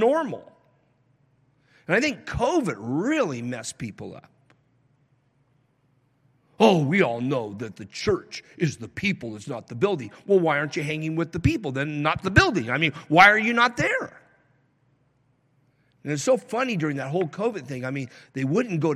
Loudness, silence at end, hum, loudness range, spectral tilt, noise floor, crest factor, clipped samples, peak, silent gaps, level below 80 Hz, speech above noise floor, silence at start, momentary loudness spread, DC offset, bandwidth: -23 LUFS; 0 s; none; 9 LU; -5.5 dB/octave; -66 dBFS; 24 dB; under 0.1%; -2 dBFS; none; -50 dBFS; 42 dB; 0 s; 15 LU; under 0.1%; 14.5 kHz